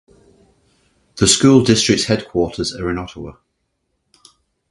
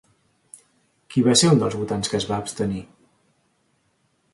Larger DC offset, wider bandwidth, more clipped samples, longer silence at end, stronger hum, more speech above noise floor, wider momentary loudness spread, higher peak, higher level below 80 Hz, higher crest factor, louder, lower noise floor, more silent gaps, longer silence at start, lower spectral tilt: neither; about the same, 11.5 kHz vs 11.5 kHz; neither; about the same, 1.4 s vs 1.5 s; neither; first, 55 dB vs 47 dB; first, 19 LU vs 11 LU; first, 0 dBFS vs -4 dBFS; first, -42 dBFS vs -54 dBFS; about the same, 18 dB vs 22 dB; first, -15 LUFS vs -21 LUFS; about the same, -70 dBFS vs -67 dBFS; neither; about the same, 1.15 s vs 1.1 s; about the same, -4 dB/octave vs -4.5 dB/octave